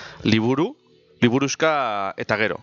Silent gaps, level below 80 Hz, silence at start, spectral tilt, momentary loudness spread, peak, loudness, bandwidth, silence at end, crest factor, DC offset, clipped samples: none; -58 dBFS; 0 s; -5 dB/octave; 5 LU; -2 dBFS; -21 LUFS; 7.4 kHz; 0.05 s; 20 dB; under 0.1%; under 0.1%